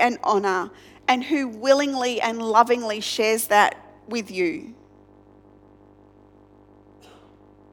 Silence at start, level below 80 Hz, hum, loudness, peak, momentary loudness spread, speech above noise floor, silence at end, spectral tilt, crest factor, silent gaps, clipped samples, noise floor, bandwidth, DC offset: 0 s; -66 dBFS; 50 Hz at -55 dBFS; -22 LUFS; -2 dBFS; 13 LU; 30 dB; 3 s; -3 dB/octave; 22 dB; none; under 0.1%; -52 dBFS; 19 kHz; under 0.1%